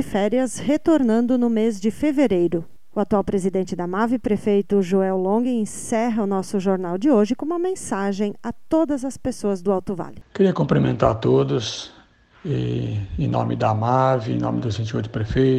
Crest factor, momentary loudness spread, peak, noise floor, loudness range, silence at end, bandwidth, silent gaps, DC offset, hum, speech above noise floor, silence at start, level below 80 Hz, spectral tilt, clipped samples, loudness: 18 dB; 8 LU; -2 dBFS; -52 dBFS; 2 LU; 0 s; 13.5 kHz; none; under 0.1%; none; 32 dB; 0 s; -46 dBFS; -7 dB/octave; under 0.1%; -21 LUFS